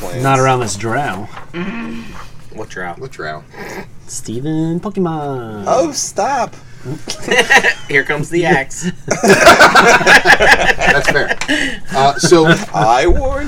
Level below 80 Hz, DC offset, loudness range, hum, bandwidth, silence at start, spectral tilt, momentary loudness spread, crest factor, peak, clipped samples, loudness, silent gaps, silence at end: -30 dBFS; under 0.1%; 15 LU; none; over 20 kHz; 0 s; -3.5 dB/octave; 21 LU; 14 dB; 0 dBFS; 1%; -11 LUFS; none; 0 s